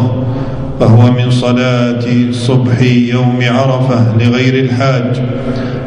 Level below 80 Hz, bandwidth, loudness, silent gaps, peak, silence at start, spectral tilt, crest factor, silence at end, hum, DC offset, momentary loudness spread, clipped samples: -34 dBFS; 10 kHz; -11 LUFS; none; 0 dBFS; 0 s; -7.5 dB/octave; 10 dB; 0 s; none; under 0.1%; 7 LU; 0.8%